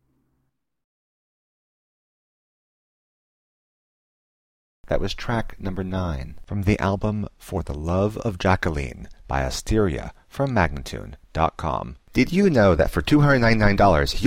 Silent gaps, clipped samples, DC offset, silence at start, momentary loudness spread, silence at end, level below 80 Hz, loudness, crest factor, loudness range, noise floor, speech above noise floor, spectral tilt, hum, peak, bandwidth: none; under 0.1%; under 0.1%; 4.85 s; 15 LU; 0 s; -34 dBFS; -22 LUFS; 18 dB; 11 LU; -74 dBFS; 53 dB; -6.5 dB/octave; none; -4 dBFS; 16 kHz